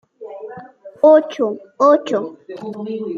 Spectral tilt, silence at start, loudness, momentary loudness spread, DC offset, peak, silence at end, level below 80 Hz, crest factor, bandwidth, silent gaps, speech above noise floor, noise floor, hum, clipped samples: -6 dB/octave; 0.2 s; -16 LUFS; 22 LU; under 0.1%; -2 dBFS; 0 s; -72 dBFS; 16 dB; 7.2 kHz; none; 22 dB; -38 dBFS; none; under 0.1%